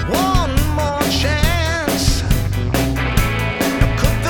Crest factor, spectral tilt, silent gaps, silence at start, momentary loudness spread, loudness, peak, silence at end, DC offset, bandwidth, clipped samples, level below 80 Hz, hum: 16 dB; -5 dB/octave; none; 0 s; 2 LU; -17 LUFS; 0 dBFS; 0 s; under 0.1%; over 20 kHz; under 0.1%; -22 dBFS; none